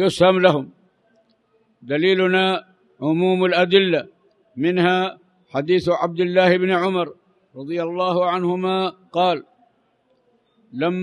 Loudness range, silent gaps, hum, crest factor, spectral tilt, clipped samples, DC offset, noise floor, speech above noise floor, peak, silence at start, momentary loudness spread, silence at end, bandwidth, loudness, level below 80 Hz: 4 LU; none; none; 18 dB; -6.5 dB/octave; under 0.1%; under 0.1%; -63 dBFS; 45 dB; -2 dBFS; 0 s; 12 LU; 0 s; 11 kHz; -19 LUFS; -62 dBFS